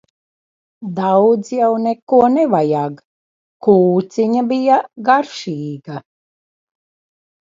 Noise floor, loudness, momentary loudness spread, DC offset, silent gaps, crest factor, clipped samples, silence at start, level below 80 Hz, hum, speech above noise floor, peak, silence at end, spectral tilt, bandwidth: under -90 dBFS; -15 LUFS; 14 LU; under 0.1%; 2.02-2.07 s, 3.05-3.60 s; 16 dB; under 0.1%; 0.8 s; -64 dBFS; none; over 75 dB; 0 dBFS; 1.55 s; -7 dB/octave; 7.8 kHz